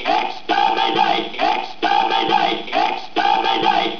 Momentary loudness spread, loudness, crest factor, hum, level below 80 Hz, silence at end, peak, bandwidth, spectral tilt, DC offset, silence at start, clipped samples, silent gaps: 4 LU; -18 LUFS; 14 dB; none; -58 dBFS; 0 s; -4 dBFS; 5.4 kHz; -3.5 dB/octave; 2%; 0 s; under 0.1%; none